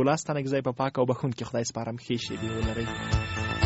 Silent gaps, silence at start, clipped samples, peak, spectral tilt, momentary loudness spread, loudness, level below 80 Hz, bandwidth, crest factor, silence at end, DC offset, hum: none; 0 s; under 0.1%; -10 dBFS; -5 dB/octave; 5 LU; -29 LUFS; -42 dBFS; 8 kHz; 18 dB; 0 s; under 0.1%; none